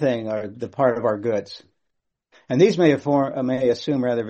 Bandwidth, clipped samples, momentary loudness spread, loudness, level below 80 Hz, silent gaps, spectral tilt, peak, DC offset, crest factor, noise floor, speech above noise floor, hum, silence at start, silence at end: 8.4 kHz; under 0.1%; 11 LU; -21 LUFS; -62 dBFS; none; -7 dB/octave; -4 dBFS; under 0.1%; 18 dB; -76 dBFS; 56 dB; none; 0 s; 0 s